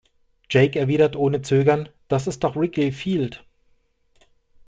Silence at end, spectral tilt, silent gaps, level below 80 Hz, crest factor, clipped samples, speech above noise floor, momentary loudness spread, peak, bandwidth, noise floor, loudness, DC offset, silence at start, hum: 1.3 s; -7 dB/octave; none; -54 dBFS; 18 dB; under 0.1%; 42 dB; 7 LU; -4 dBFS; 9.2 kHz; -62 dBFS; -21 LUFS; under 0.1%; 0.5 s; none